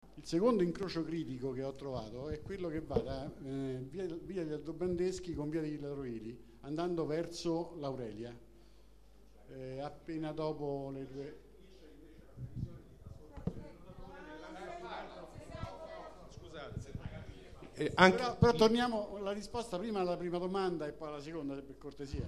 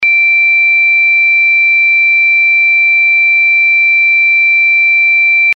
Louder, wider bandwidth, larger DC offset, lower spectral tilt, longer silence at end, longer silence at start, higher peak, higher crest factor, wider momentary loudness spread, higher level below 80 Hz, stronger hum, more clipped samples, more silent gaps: second, -37 LUFS vs -6 LUFS; first, 13.5 kHz vs 5.8 kHz; neither; first, -6 dB/octave vs 6.5 dB/octave; about the same, 0 s vs 0 s; about the same, 0 s vs 0 s; second, -8 dBFS vs -4 dBFS; first, 30 dB vs 4 dB; first, 20 LU vs 0 LU; first, -56 dBFS vs -70 dBFS; first, 50 Hz at -60 dBFS vs none; neither; neither